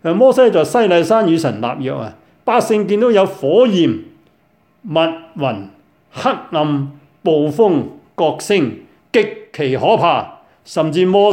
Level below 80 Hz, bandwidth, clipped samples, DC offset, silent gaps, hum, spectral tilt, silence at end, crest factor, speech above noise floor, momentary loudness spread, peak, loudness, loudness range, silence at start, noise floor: -62 dBFS; 16.5 kHz; under 0.1%; under 0.1%; none; none; -6 dB/octave; 0 s; 14 dB; 42 dB; 12 LU; 0 dBFS; -15 LUFS; 5 LU; 0.05 s; -56 dBFS